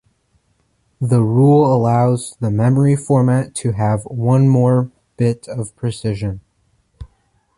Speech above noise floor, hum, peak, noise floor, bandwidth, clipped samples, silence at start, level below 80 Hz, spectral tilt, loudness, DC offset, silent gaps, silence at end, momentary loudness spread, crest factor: 48 dB; none; -2 dBFS; -62 dBFS; 11.5 kHz; under 0.1%; 1 s; -46 dBFS; -8 dB/octave; -16 LUFS; under 0.1%; none; 0.55 s; 12 LU; 14 dB